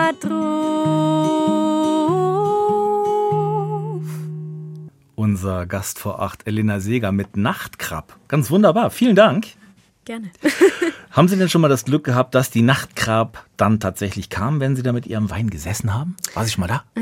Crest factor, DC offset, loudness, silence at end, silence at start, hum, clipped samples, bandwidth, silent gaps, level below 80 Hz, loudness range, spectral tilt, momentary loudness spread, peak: 18 dB; under 0.1%; -19 LUFS; 0 s; 0 s; none; under 0.1%; 16.5 kHz; none; -52 dBFS; 6 LU; -6 dB/octave; 12 LU; 0 dBFS